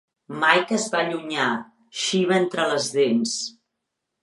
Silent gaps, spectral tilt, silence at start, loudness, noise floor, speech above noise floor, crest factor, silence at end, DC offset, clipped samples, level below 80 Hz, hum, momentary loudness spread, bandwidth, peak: none; -3.5 dB/octave; 0.3 s; -22 LUFS; -80 dBFS; 58 dB; 22 dB; 0.7 s; under 0.1%; under 0.1%; -76 dBFS; none; 11 LU; 11.5 kHz; -2 dBFS